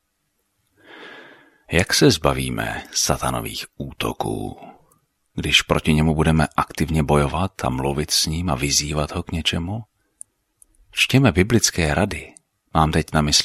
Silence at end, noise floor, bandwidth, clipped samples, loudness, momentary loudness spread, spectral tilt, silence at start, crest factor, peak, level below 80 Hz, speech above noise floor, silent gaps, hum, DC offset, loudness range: 0 s; -71 dBFS; 15 kHz; under 0.1%; -20 LUFS; 14 LU; -4 dB/octave; 0.9 s; 20 dB; 0 dBFS; -36 dBFS; 52 dB; none; none; under 0.1%; 3 LU